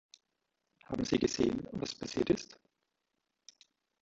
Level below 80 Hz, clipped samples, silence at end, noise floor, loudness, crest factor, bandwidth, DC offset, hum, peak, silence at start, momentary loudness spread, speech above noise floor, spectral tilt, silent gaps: -62 dBFS; under 0.1%; 1.45 s; -85 dBFS; -34 LUFS; 22 dB; 8 kHz; under 0.1%; none; -16 dBFS; 0.9 s; 9 LU; 51 dB; -5 dB/octave; none